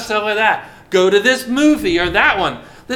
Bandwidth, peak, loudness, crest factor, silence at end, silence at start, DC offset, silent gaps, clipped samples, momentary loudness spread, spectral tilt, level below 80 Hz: 16.5 kHz; 0 dBFS; -15 LUFS; 16 dB; 0 s; 0 s; under 0.1%; none; under 0.1%; 8 LU; -4 dB/octave; -40 dBFS